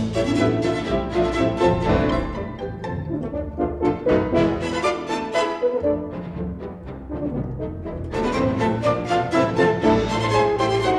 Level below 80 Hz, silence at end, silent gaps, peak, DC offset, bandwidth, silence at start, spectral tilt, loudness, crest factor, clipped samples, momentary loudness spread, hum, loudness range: -36 dBFS; 0 s; none; -6 dBFS; under 0.1%; 11.5 kHz; 0 s; -6.5 dB/octave; -22 LUFS; 16 dB; under 0.1%; 11 LU; none; 5 LU